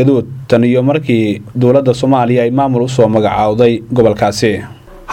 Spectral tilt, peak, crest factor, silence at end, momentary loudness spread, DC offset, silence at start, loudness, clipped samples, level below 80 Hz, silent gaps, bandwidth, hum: -7 dB/octave; 0 dBFS; 12 dB; 0 s; 5 LU; under 0.1%; 0 s; -12 LUFS; under 0.1%; -42 dBFS; none; 15.5 kHz; none